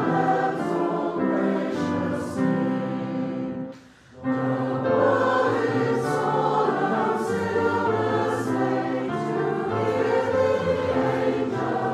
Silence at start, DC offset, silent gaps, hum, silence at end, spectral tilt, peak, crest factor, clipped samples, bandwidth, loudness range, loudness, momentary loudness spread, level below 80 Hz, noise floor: 0 s; under 0.1%; none; none; 0 s; -7 dB/octave; -8 dBFS; 14 dB; under 0.1%; 13 kHz; 4 LU; -24 LUFS; 6 LU; -62 dBFS; -47 dBFS